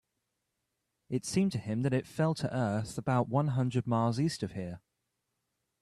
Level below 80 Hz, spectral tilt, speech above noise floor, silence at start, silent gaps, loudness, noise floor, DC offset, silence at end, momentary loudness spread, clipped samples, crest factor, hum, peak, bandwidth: -64 dBFS; -6.5 dB/octave; 52 dB; 1.1 s; none; -32 LUFS; -83 dBFS; under 0.1%; 1.05 s; 8 LU; under 0.1%; 16 dB; none; -16 dBFS; 13 kHz